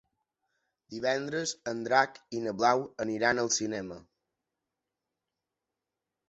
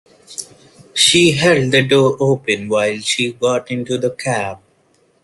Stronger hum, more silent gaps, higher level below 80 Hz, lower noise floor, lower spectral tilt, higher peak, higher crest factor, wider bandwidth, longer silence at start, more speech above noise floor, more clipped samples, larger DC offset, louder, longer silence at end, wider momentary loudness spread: neither; neither; second, -70 dBFS vs -54 dBFS; first, -88 dBFS vs -57 dBFS; about the same, -3 dB/octave vs -3.5 dB/octave; second, -8 dBFS vs 0 dBFS; first, 26 dB vs 16 dB; second, 8.4 kHz vs 12.5 kHz; first, 0.9 s vs 0.3 s; first, 58 dB vs 42 dB; neither; neither; second, -30 LUFS vs -15 LUFS; first, 2.3 s vs 0.7 s; second, 11 LU vs 15 LU